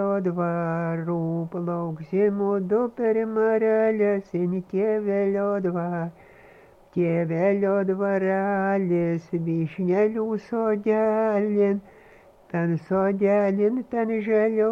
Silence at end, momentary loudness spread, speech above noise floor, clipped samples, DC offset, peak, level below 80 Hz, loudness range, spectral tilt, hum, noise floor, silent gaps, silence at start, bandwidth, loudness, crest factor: 0 s; 7 LU; 29 dB; under 0.1%; under 0.1%; -10 dBFS; -64 dBFS; 2 LU; -10 dB/octave; none; -52 dBFS; none; 0 s; 6.4 kHz; -24 LUFS; 12 dB